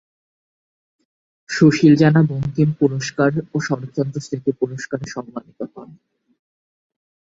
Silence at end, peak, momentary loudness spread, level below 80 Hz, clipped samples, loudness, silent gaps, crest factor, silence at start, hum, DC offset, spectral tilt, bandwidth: 1.55 s; -2 dBFS; 18 LU; -56 dBFS; under 0.1%; -18 LUFS; none; 18 dB; 1.5 s; none; under 0.1%; -7 dB/octave; 7.8 kHz